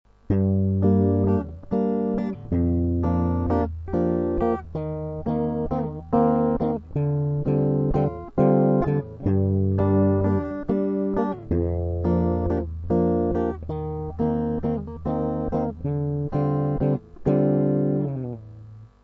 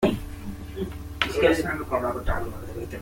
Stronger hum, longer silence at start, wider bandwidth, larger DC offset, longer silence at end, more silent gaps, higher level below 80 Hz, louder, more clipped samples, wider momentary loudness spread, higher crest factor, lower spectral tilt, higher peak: neither; first, 0.3 s vs 0 s; second, 5.2 kHz vs 17 kHz; neither; first, 0.15 s vs 0 s; neither; about the same, -38 dBFS vs -38 dBFS; first, -24 LUFS vs -27 LUFS; neither; second, 8 LU vs 15 LU; second, 18 dB vs 24 dB; first, -12 dB/octave vs -5.5 dB/octave; second, -6 dBFS vs -2 dBFS